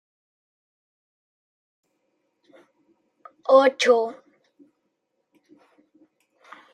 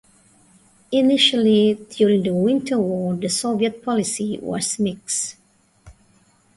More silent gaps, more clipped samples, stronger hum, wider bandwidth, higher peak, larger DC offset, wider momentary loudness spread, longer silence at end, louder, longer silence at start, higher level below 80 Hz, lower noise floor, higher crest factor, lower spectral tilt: neither; neither; neither; about the same, 10.5 kHz vs 11.5 kHz; about the same, -4 dBFS vs -4 dBFS; neither; first, 15 LU vs 9 LU; first, 2.6 s vs 0.65 s; about the same, -20 LUFS vs -20 LUFS; first, 3.5 s vs 0.9 s; second, -84 dBFS vs -60 dBFS; first, -76 dBFS vs -57 dBFS; first, 24 dB vs 16 dB; second, -2 dB/octave vs -4 dB/octave